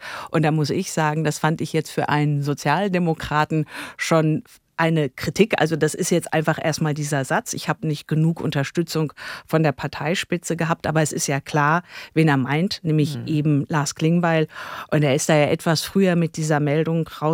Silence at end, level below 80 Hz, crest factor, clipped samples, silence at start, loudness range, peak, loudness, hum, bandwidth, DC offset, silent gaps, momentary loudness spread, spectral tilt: 0 s; -56 dBFS; 18 dB; under 0.1%; 0 s; 3 LU; -4 dBFS; -21 LUFS; none; 16.5 kHz; under 0.1%; none; 6 LU; -5.5 dB/octave